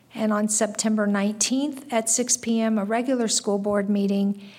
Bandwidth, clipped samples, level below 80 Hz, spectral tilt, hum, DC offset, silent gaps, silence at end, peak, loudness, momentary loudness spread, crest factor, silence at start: 16 kHz; under 0.1%; -68 dBFS; -3.5 dB/octave; none; under 0.1%; none; 0 s; -8 dBFS; -23 LUFS; 3 LU; 16 dB; 0.15 s